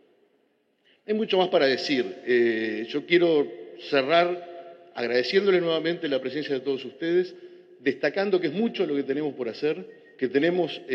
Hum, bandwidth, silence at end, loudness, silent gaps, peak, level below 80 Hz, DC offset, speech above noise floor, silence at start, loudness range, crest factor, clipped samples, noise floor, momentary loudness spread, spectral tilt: none; 7 kHz; 0 s; -25 LUFS; none; -6 dBFS; -88 dBFS; under 0.1%; 44 dB; 1.1 s; 3 LU; 20 dB; under 0.1%; -68 dBFS; 11 LU; -6 dB/octave